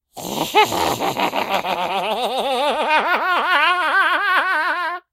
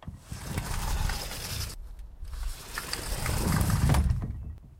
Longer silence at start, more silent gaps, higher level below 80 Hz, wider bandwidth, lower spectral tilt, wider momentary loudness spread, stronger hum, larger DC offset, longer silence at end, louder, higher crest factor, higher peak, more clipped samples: first, 0.15 s vs 0 s; neither; second, -56 dBFS vs -34 dBFS; about the same, 16 kHz vs 16.5 kHz; second, -2.5 dB/octave vs -4.5 dB/octave; second, 6 LU vs 17 LU; neither; neither; first, 0.15 s vs 0 s; first, -18 LUFS vs -31 LUFS; about the same, 20 dB vs 18 dB; first, 0 dBFS vs -12 dBFS; neither